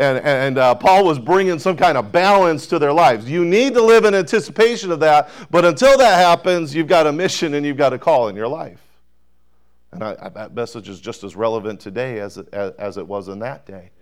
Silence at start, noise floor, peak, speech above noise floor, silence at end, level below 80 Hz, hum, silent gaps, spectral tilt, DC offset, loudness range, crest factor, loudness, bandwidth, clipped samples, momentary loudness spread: 0 s; -63 dBFS; -6 dBFS; 48 dB; 0.2 s; -52 dBFS; none; none; -5 dB/octave; 0.4%; 13 LU; 10 dB; -15 LUFS; 17.5 kHz; under 0.1%; 18 LU